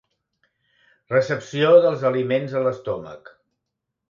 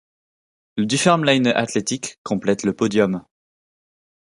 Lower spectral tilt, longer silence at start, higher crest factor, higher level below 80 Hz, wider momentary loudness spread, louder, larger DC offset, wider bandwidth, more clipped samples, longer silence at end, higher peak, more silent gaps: first, -6.5 dB/octave vs -4.5 dB/octave; first, 1.1 s vs 0.75 s; about the same, 20 dB vs 20 dB; about the same, -64 dBFS vs -60 dBFS; first, 15 LU vs 10 LU; about the same, -20 LUFS vs -19 LUFS; neither; second, 7.4 kHz vs 11.5 kHz; neither; second, 0.9 s vs 1.15 s; about the same, -2 dBFS vs -2 dBFS; second, none vs 2.18-2.25 s